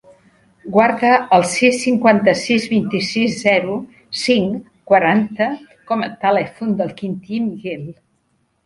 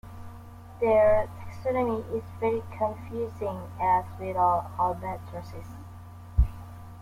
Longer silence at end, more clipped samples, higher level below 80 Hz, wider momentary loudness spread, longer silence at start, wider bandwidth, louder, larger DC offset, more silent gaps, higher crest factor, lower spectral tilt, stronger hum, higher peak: first, 0.75 s vs 0 s; neither; second, -58 dBFS vs -38 dBFS; second, 14 LU vs 21 LU; first, 0.65 s vs 0.05 s; second, 11.5 kHz vs 16 kHz; first, -17 LUFS vs -28 LUFS; neither; neither; about the same, 18 dB vs 18 dB; second, -5 dB/octave vs -8.5 dB/octave; neither; first, 0 dBFS vs -10 dBFS